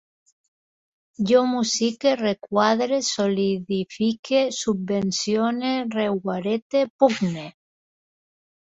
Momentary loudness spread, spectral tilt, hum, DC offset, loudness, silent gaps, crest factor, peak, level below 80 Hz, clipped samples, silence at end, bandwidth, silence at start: 6 LU; -4.5 dB/octave; none; under 0.1%; -22 LUFS; 4.19-4.23 s, 6.62-6.70 s, 6.90-6.99 s; 20 dB; -4 dBFS; -64 dBFS; under 0.1%; 1.25 s; 8 kHz; 1.2 s